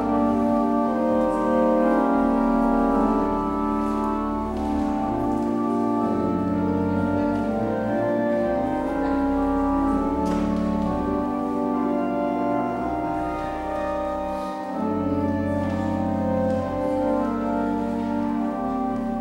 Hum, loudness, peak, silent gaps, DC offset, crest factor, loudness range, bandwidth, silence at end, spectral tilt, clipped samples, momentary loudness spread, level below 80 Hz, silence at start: none; -23 LUFS; -10 dBFS; none; under 0.1%; 14 dB; 4 LU; 15 kHz; 0 s; -8.5 dB/octave; under 0.1%; 6 LU; -40 dBFS; 0 s